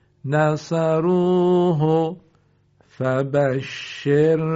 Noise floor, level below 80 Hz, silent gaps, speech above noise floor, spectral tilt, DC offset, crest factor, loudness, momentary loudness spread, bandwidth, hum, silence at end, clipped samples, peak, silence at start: -60 dBFS; -60 dBFS; none; 41 dB; -7 dB/octave; under 0.1%; 14 dB; -20 LUFS; 10 LU; 7.8 kHz; none; 0 s; under 0.1%; -6 dBFS; 0.25 s